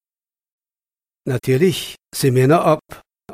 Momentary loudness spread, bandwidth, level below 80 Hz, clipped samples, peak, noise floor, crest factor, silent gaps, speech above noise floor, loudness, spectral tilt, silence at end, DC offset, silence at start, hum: 12 LU; 16 kHz; -54 dBFS; under 0.1%; -2 dBFS; under -90 dBFS; 18 dB; none; over 73 dB; -17 LUFS; -6 dB/octave; 0 s; under 0.1%; 1.25 s; none